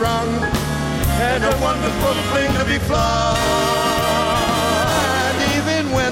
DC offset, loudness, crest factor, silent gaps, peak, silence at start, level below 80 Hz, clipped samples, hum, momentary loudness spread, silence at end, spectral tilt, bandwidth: under 0.1%; -18 LUFS; 12 dB; none; -6 dBFS; 0 s; -30 dBFS; under 0.1%; none; 3 LU; 0 s; -4.5 dB/octave; 17 kHz